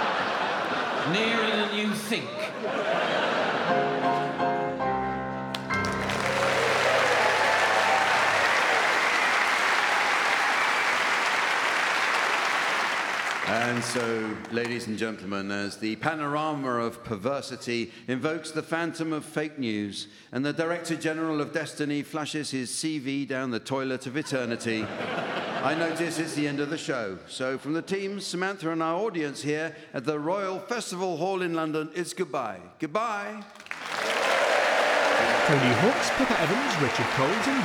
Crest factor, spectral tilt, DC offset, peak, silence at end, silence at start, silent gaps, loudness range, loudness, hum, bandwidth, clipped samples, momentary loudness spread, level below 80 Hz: 20 dB; -4 dB/octave; under 0.1%; -8 dBFS; 0 s; 0 s; none; 8 LU; -26 LUFS; none; over 20 kHz; under 0.1%; 10 LU; -62 dBFS